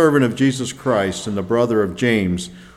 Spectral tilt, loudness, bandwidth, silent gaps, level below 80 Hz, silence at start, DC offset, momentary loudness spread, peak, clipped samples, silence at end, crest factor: -5.5 dB/octave; -19 LUFS; 14 kHz; none; -48 dBFS; 0 s; under 0.1%; 7 LU; -2 dBFS; under 0.1%; 0.1 s; 16 dB